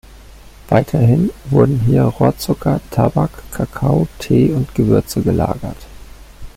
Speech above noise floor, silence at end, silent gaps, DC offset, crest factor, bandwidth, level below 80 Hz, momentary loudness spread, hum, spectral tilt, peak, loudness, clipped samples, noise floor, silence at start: 24 dB; 0.1 s; none; under 0.1%; 14 dB; 16 kHz; -36 dBFS; 8 LU; none; -8 dB/octave; -2 dBFS; -16 LUFS; under 0.1%; -38 dBFS; 0.1 s